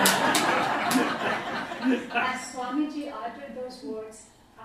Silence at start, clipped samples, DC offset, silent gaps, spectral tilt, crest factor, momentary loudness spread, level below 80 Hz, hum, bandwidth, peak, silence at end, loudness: 0 s; under 0.1%; under 0.1%; none; -2.5 dB/octave; 26 dB; 15 LU; -64 dBFS; none; 15.5 kHz; -2 dBFS; 0 s; -27 LUFS